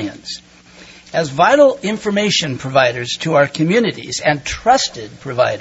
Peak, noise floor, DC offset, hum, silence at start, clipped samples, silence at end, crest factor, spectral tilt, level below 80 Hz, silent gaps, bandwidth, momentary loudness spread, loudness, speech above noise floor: 0 dBFS; -42 dBFS; under 0.1%; none; 0 s; under 0.1%; 0 s; 16 dB; -4 dB/octave; -46 dBFS; none; 8 kHz; 13 LU; -16 LUFS; 26 dB